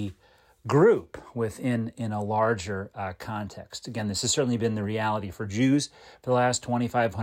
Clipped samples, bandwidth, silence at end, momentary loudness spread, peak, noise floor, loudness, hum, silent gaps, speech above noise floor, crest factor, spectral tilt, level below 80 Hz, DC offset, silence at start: under 0.1%; 16 kHz; 0 s; 13 LU; -10 dBFS; -60 dBFS; -27 LUFS; none; none; 34 dB; 18 dB; -5 dB/octave; -58 dBFS; under 0.1%; 0 s